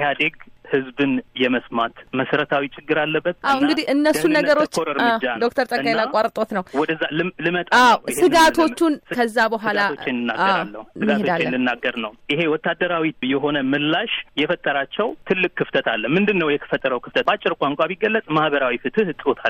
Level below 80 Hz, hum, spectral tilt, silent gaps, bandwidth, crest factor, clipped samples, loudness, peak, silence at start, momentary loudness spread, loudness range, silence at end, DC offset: -56 dBFS; none; -4.5 dB/octave; none; 16 kHz; 14 dB; under 0.1%; -20 LUFS; -6 dBFS; 0 s; 7 LU; 4 LU; 0 s; under 0.1%